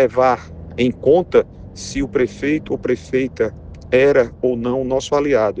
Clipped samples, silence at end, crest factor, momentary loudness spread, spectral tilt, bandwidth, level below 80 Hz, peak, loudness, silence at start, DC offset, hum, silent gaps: under 0.1%; 0 s; 16 dB; 10 LU; -6 dB/octave; 9.4 kHz; -42 dBFS; -2 dBFS; -18 LUFS; 0 s; under 0.1%; none; none